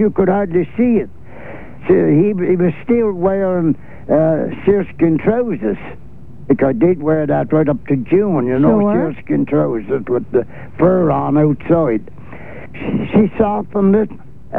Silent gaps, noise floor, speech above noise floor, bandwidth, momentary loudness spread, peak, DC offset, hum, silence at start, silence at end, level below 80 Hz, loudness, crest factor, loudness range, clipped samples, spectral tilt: none; -34 dBFS; 19 dB; 3.8 kHz; 12 LU; 0 dBFS; 3%; none; 0 s; 0 s; -42 dBFS; -15 LUFS; 16 dB; 2 LU; under 0.1%; -11.5 dB/octave